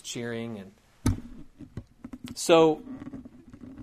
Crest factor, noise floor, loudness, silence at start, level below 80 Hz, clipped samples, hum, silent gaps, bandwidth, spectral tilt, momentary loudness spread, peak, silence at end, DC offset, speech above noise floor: 24 dB; -47 dBFS; -26 LUFS; 0.05 s; -46 dBFS; under 0.1%; none; none; 15.5 kHz; -5 dB/octave; 27 LU; -6 dBFS; 0 s; under 0.1%; 22 dB